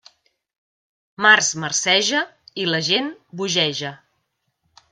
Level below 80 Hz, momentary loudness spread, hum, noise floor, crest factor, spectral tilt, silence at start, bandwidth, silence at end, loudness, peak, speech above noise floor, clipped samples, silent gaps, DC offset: -70 dBFS; 15 LU; none; -73 dBFS; 22 dB; -1.5 dB/octave; 1.2 s; 13.5 kHz; 0.95 s; -18 LUFS; 0 dBFS; 53 dB; under 0.1%; none; under 0.1%